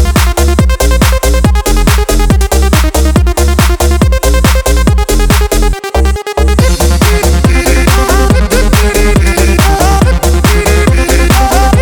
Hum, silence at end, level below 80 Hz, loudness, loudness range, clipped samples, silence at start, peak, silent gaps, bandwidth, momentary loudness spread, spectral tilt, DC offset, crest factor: none; 0 s; -10 dBFS; -9 LUFS; 1 LU; 0.5%; 0 s; 0 dBFS; none; 20 kHz; 2 LU; -5 dB/octave; under 0.1%; 6 dB